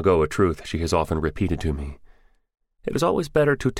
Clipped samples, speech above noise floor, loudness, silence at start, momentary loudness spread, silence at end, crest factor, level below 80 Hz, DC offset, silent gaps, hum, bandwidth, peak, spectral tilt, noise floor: under 0.1%; 32 dB; -23 LUFS; 0 s; 10 LU; 0 s; 18 dB; -36 dBFS; under 0.1%; none; none; 16 kHz; -6 dBFS; -6.5 dB/octave; -54 dBFS